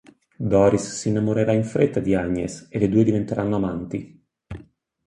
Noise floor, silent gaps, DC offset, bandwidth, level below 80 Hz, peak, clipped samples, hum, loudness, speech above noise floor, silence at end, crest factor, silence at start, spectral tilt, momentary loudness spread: -49 dBFS; none; under 0.1%; 11 kHz; -46 dBFS; -4 dBFS; under 0.1%; none; -22 LUFS; 28 dB; 0.45 s; 18 dB; 0.4 s; -7 dB/octave; 14 LU